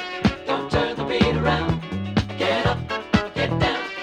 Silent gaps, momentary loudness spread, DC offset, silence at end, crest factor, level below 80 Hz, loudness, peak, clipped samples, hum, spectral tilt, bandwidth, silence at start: none; 5 LU; under 0.1%; 0 s; 18 dB; -38 dBFS; -23 LUFS; -4 dBFS; under 0.1%; none; -6.5 dB/octave; 10.5 kHz; 0 s